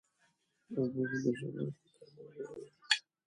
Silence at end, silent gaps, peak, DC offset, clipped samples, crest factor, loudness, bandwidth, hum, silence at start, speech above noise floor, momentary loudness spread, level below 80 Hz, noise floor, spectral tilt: 0.25 s; none; -12 dBFS; under 0.1%; under 0.1%; 28 dB; -37 LUFS; 11 kHz; none; 0.7 s; 38 dB; 20 LU; -80 dBFS; -76 dBFS; -4.5 dB/octave